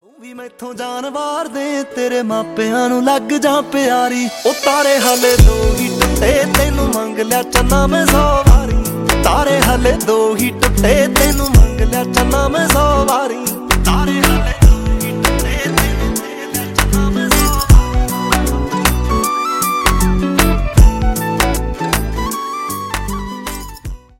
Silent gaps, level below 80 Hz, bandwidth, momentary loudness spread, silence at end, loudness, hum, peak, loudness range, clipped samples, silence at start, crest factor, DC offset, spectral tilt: none; -18 dBFS; 17 kHz; 10 LU; 0.25 s; -14 LUFS; none; 0 dBFS; 3 LU; under 0.1%; 0.2 s; 12 dB; under 0.1%; -4.5 dB/octave